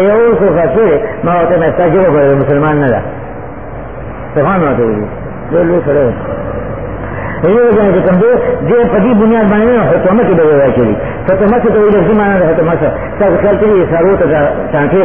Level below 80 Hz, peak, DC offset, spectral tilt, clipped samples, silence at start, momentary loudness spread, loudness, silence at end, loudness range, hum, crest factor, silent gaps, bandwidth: -30 dBFS; 0 dBFS; 3%; -12.5 dB/octave; under 0.1%; 0 s; 12 LU; -10 LUFS; 0 s; 5 LU; none; 10 dB; none; 3.6 kHz